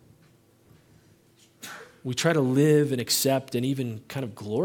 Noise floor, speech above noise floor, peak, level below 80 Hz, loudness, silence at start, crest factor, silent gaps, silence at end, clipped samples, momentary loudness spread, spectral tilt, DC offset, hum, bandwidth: -59 dBFS; 35 dB; -8 dBFS; -70 dBFS; -25 LUFS; 1.6 s; 20 dB; none; 0 s; under 0.1%; 21 LU; -5 dB/octave; under 0.1%; none; 17.5 kHz